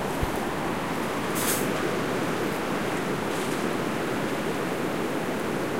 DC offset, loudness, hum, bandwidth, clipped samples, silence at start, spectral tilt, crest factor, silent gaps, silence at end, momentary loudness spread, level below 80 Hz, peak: 0.8%; -28 LUFS; none; 16 kHz; under 0.1%; 0 s; -4.5 dB/octave; 16 dB; none; 0 s; 3 LU; -46 dBFS; -12 dBFS